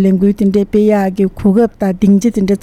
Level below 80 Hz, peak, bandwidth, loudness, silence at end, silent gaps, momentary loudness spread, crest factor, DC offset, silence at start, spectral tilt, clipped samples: -36 dBFS; -2 dBFS; 13 kHz; -12 LUFS; 0.05 s; none; 3 LU; 10 dB; under 0.1%; 0 s; -8 dB/octave; under 0.1%